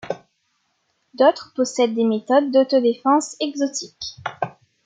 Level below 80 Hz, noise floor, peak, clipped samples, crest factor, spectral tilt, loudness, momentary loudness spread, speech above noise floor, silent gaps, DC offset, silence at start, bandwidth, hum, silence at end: -68 dBFS; -69 dBFS; -4 dBFS; under 0.1%; 18 dB; -4 dB/octave; -20 LUFS; 13 LU; 50 dB; none; under 0.1%; 0.05 s; 9.4 kHz; none; 0.35 s